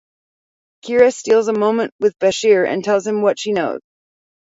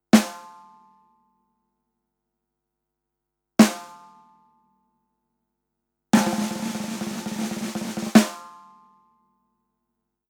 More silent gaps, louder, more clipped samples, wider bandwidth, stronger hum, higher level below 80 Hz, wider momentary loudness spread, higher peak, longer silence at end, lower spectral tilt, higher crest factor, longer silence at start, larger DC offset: first, 1.92-1.99 s vs none; first, -16 LUFS vs -23 LUFS; neither; second, 7.8 kHz vs 19 kHz; second, none vs 50 Hz at -50 dBFS; about the same, -62 dBFS vs -64 dBFS; second, 7 LU vs 17 LU; about the same, 0 dBFS vs 0 dBFS; second, 0.6 s vs 1.8 s; about the same, -4.5 dB/octave vs -4.5 dB/octave; second, 16 dB vs 26 dB; first, 0.85 s vs 0.15 s; neither